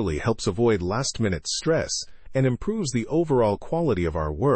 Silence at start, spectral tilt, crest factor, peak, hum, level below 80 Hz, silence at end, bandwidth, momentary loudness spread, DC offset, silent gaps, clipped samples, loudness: 0 s; -5.5 dB/octave; 14 dB; -10 dBFS; none; -42 dBFS; 0 s; 8.8 kHz; 5 LU; under 0.1%; none; under 0.1%; -24 LUFS